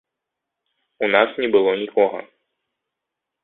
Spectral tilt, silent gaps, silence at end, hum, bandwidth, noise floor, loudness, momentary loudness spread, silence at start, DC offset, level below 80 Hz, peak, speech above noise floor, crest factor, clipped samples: -8.5 dB/octave; none; 1.2 s; none; 4.2 kHz; -83 dBFS; -19 LUFS; 6 LU; 1 s; under 0.1%; -68 dBFS; -2 dBFS; 64 dB; 22 dB; under 0.1%